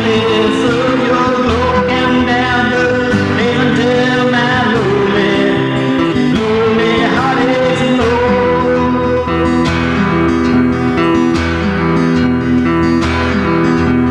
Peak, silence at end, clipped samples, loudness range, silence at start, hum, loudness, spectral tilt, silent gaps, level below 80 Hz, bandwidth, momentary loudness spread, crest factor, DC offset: -2 dBFS; 0 s; under 0.1%; 1 LU; 0 s; none; -12 LUFS; -6.5 dB/octave; none; -32 dBFS; 10 kHz; 2 LU; 10 dB; under 0.1%